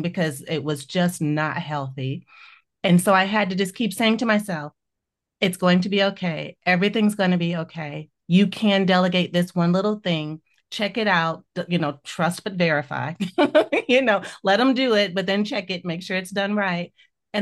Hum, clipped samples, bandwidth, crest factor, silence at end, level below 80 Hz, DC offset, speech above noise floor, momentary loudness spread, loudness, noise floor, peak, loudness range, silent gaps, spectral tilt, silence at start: none; under 0.1%; 12.5 kHz; 18 dB; 0 s; -68 dBFS; under 0.1%; 61 dB; 11 LU; -22 LUFS; -83 dBFS; -4 dBFS; 3 LU; none; -5.5 dB/octave; 0 s